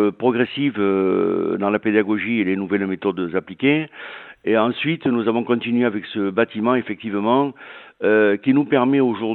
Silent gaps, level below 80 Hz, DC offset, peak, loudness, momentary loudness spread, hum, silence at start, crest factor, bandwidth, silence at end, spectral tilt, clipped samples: none; -66 dBFS; under 0.1%; -2 dBFS; -20 LUFS; 8 LU; none; 0 s; 18 dB; 4.3 kHz; 0 s; -10 dB/octave; under 0.1%